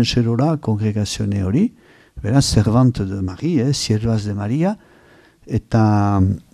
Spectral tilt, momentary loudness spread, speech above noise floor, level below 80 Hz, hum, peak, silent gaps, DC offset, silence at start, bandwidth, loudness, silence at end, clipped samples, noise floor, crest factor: -6.5 dB/octave; 8 LU; 32 dB; -38 dBFS; none; 0 dBFS; none; under 0.1%; 0 s; 13 kHz; -18 LUFS; 0.15 s; under 0.1%; -50 dBFS; 16 dB